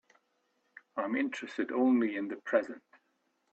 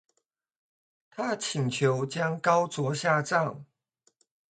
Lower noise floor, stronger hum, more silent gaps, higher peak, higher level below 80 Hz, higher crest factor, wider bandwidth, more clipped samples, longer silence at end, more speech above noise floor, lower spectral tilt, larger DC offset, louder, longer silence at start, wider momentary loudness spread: about the same, -77 dBFS vs -79 dBFS; neither; neither; second, -14 dBFS vs -8 dBFS; second, -82 dBFS vs -74 dBFS; about the same, 20 dB vs 22 dB; second, 8 kHz vs 9.4 kHz; neither; second, 0.75 s vs 0.9 s; second, 46 dB vs 52 dB; about the same, -5.5 dB/octave vs -5 dB/octave; neither; second, -32 LUFS vs -28 LUFS; second, 0.95 s vs 1.15 s; first, 14 LU vs 9 LU